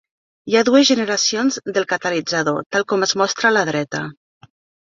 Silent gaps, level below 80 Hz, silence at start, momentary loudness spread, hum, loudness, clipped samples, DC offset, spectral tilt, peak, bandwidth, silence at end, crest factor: 2.66-2.70 s; -64 dBFS; 0.45 s; 10 LU; none; -18 LUFS; under 0.1%; under 0.1%; -3 dB/octave; -2 dBFS; 7.6 kHz; 0.75 s; 18 dB